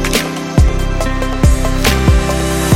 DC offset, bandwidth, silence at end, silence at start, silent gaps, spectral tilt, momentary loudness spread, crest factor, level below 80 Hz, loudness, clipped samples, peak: 0.2%; 16.5 kHz; 0 s; 0 s; none; -5 dB/octave; 5 LU; 12 dB; -16 dBFS; -14 LUFS; under 0.1%; 0 dBFS